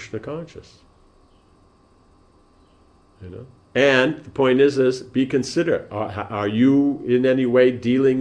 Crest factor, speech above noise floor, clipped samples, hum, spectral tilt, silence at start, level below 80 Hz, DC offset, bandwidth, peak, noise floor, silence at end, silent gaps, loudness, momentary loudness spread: 20 dB; 36 dB; under 0.1%; none; -6 dB/octave; 0 s; -56 dBFS; under 0.1%; 10 kHz; -2 dBFS; -55 dBFS; 0 s; none; -19 LUFS; 17 LU